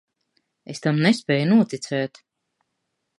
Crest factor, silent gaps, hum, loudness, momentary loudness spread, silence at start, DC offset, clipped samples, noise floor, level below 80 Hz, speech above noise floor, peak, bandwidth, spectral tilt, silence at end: 20 dB; none; none; -21 LUFS; 11 LU; 0.7 s; under 0.1%; under 0.1%; -77 dBFS; -72 dBFS; 57 dB; -4 dBFS; 11.5 kHz; -6 dB/octave; 1.15 s